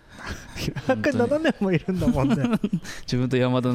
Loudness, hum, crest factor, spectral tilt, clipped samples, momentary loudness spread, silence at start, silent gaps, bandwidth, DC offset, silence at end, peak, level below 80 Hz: -24 LUFS; none; 14 dB; -6.5 dB/octave; under 0.1%; 9 LU; 0.1 s; none; 15.5 kHz; under 0.1%; 0 s; -10 dBFS; -42 dBFS